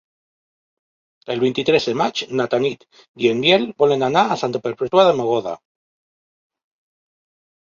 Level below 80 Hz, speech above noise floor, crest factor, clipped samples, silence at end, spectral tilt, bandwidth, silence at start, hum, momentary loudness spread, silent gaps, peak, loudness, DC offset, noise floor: -62 dBFS; over 72 dB; 20 dB; under 0.1%; 2.1 s; -5 dB/octave; 7.4 kHz; 1.3 s; none; 9 LU; 3.08-3.14 s; -2 dBFS; -18 LUFS; under 0.1%; under -90 dBFS